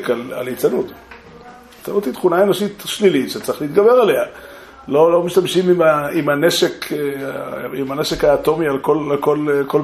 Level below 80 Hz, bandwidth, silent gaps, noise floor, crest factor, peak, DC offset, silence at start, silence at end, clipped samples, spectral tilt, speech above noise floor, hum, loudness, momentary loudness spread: -48 dBFS; 15.5 kHz; none; -40 dBFS; 16 dB; -2 dBFS; under 0.1%; 0 s; 0 s; under 0.1%; -5 dB/octave; 24 dB; none; -17 LUFS; 12 LU